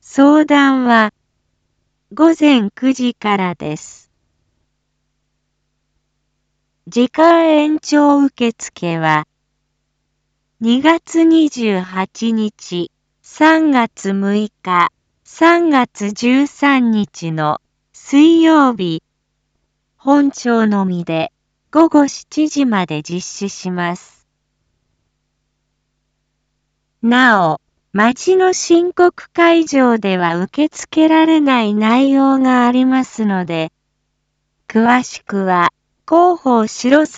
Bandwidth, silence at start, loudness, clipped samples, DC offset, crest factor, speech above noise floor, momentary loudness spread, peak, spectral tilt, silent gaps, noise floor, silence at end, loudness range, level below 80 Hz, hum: 8 kHz; 0.15 s; -14 LUFS; under 0.1%; under 0.1%; 14 dB; 56 dB; 12 LU; 0 dBFS; -5 dB/octave; none; -69 dBFS; 0 s; 8 LU; -62 dBFS; none